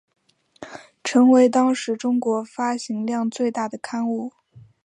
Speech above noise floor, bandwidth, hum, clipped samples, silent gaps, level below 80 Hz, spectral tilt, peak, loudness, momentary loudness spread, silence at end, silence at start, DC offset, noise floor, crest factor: 24 dB; 10 kHz; none; under 0.1%; none; -72 dBFS; -4.5 dB/octave; -4 dBFS; -21 LUFS; 17 LU; 0.25 s; 0.6 s; under 0.1%; -44 dBFS; 16 dB